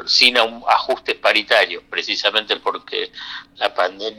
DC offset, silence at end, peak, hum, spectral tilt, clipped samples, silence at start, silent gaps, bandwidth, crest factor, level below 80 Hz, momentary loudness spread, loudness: under 0.1%; 0.05 s; 0 dBFS; none; -0.5 dB/octave; under 0.1%; 0 s; none; over 20 kHz; 20 dB; -60 dBFS; 12 LU; -17 LUFS